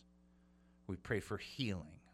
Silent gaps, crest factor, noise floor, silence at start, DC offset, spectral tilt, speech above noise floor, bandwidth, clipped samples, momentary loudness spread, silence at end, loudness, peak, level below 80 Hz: none; 22 dB; -68 dBFS; 0.9 s; under 0.1%; -5.5 dB/octave; 26 dB; 15.5 kHz; under 0.1%; 8 LU; 0.05 s; -43 LUFS; -22 dBFS; -64 dBFS